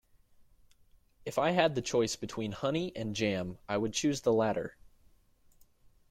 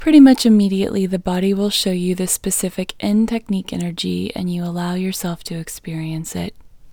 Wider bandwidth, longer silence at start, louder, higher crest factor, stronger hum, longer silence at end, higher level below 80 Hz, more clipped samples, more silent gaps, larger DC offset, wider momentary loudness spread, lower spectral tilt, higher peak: second, 16 kHz vs over 20 kHz; first, 0.4 s vs 0 s; second, -32 LUFS vs -18 LUFS; about the same, 22 dB vs 18 dB; neither; first, 1.4 s vs 0 s; second, -62 dBFS vs -46 dBFS; neither; neither; neither; second, 9 LU vs 13 LU; about the same, -4.5 dB/octave vs -5 dB/octave; second, -12 dBFS vs 0 dBFS